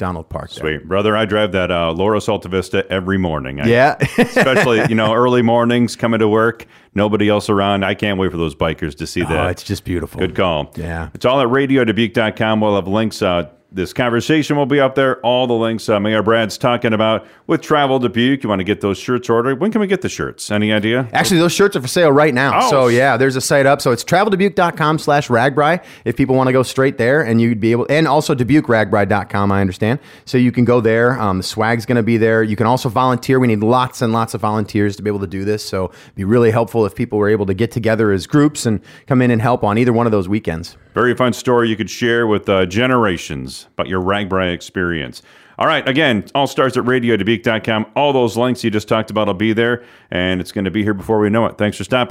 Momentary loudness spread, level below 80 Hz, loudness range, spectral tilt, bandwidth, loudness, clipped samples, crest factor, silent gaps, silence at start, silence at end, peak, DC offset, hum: 8 LU; -46 dBFS; 4 LU; -5.5 dB/octave; 16 kHz; -16 LUFS; under 0.1%; 12 dB; none; 0 s; 0 s; -2 dBFS; under 0.1%; none